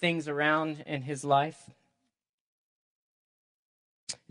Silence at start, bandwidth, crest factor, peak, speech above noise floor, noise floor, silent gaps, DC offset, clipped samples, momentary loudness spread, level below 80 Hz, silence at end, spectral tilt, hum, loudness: 0 s; 11.5 kHz; 22 dB; -12 dBFS; 49 dB; -79 dBFS; 2.29-4.07 s; under 0.1%; under 0.1%; 14 LU; -78 dBFS; 0.15 s; -4.5 dB/octave; none; -29 LUFS